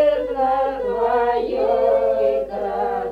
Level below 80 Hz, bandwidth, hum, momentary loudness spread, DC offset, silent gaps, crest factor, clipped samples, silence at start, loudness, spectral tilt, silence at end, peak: -46 dBFS; 5.4 kHz; none; 6 LU; under 0.1%; none; 12 dB; under 0.1%; 0 s; -20 LUFS; -6.5 dB/octave; 0 s; -8 dBFS